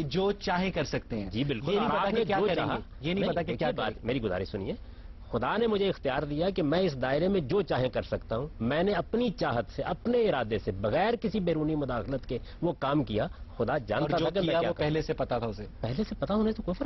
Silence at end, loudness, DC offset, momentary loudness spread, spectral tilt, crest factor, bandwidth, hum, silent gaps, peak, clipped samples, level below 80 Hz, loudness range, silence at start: 0 s; -30 LUFS; under 0.1%; 7 LU; -7.5 dB/octave; 14 dB; 6.2 kHz; none; none; -16 dBFS; under 0.1%; -46 dBFS; 2 LU; 0 s